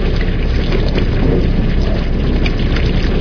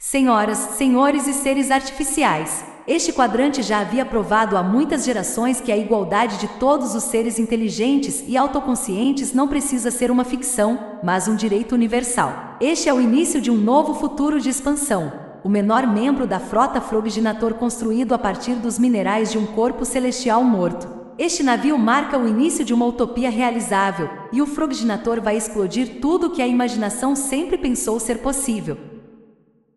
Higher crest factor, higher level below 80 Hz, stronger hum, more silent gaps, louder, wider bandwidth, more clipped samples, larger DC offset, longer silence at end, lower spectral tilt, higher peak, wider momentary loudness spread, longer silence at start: about the same, 12 dB vs 16 dB; first, -14 dBFS vs -46 dBFS; neither; neither; first, -16 LUFS vs -19 LUFS; second, 5.4 kHz vs 12.5 kHz; neither; neither; second, 0 s vs 0.75 s; first, -8 dB/octave vs -4 dB/octave; first, 0 dBFS vs -4 dBFS; about the same, 3 LU vs 5 LU; about the same, 0 s vs 0 s